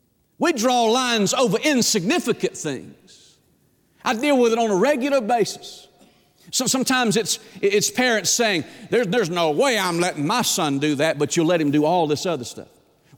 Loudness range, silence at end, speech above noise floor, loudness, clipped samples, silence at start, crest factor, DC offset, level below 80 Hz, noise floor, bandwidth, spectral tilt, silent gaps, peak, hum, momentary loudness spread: 2 LU; 0.55 s; 41 dB; -20 LUFS; under 0.1%; 0.4 s; 12 dB; under 0.1%; -66 dBFS; -61 dBFS; 19 kHz; -3.5 dB/octave; none; -8 dBFS; none; 8 LU